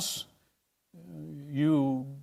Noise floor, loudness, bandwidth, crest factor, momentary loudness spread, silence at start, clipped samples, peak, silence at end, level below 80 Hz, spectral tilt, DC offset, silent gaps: -75 dBFS; -29 LUFS; 16 kHz; 16 dB; 20 LU; 0 s; under 0.1%; -16 dBFS; 0 s; -72 dBFS; -5 dB/octave; under 0.1%; none